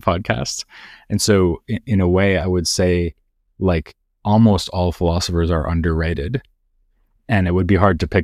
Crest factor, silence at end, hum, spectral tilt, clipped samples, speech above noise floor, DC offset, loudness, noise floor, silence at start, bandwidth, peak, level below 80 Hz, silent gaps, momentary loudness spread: 18 dB; 0 s; none; -5.5 dB/octave; under 0.1%; 44 dB; 0.1%; -18 LUFS; -62 dBFS; 0.05 s; 14.5 kHz; 0 dBFS; -32 dBFS; none; 10 LU